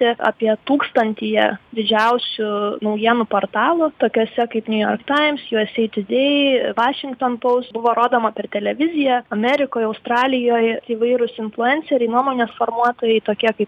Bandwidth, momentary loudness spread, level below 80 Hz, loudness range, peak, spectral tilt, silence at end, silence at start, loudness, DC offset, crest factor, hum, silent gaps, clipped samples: 8.2 kHz; 5 LU; -66 dBFS; 1 LU; -2 dBFS; -6 dB/octave; 0 s; 0 s; -18 LUFS; under 0.1%; 16 dB; none; none; under 0.1%